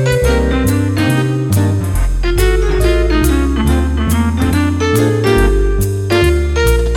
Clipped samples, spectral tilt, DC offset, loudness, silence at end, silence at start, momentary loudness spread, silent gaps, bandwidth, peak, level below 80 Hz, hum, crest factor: under 0.1%; -6 dB/octave; under 0.1%; -14 LUFS; 0 s; 0 s; 3 LU; none; 17.5 kHz; 0 dBFS; -16 dBFS; none; 12 dB